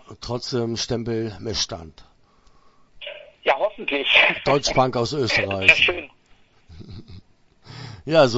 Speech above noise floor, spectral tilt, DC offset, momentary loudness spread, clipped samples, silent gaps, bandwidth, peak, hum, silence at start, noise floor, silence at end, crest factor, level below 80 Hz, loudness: 34 dB; -3.5 dB/octave; under 0.1%; 22 LU; under 0.1%; none; 8.2 kHz; 0 dBFS; none; 0.1 s; -55 dBFS; 0 s; 24 dB; -48 dBFS; -20 LUFS